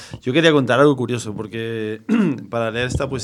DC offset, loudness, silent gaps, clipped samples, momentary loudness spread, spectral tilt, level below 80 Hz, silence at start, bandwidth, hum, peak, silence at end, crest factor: under 0.1%; -19 LUFS; none; under 0.1%; 11 LU; -6 dB/octave; -42 dBFS; 0 s; 13 kHz; none; 0 dBFS; 0 s; 18 dB